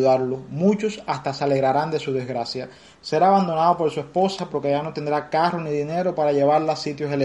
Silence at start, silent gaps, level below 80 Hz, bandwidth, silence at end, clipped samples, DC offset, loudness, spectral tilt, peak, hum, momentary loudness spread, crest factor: 0 s; none; -62 dBFS; 11.5 kHz; 0 s; under 0.1%; under 0.1%; -22 LUFS; -6.5 dB/octave; -6 dBFS; none; 9 LU; 16 dB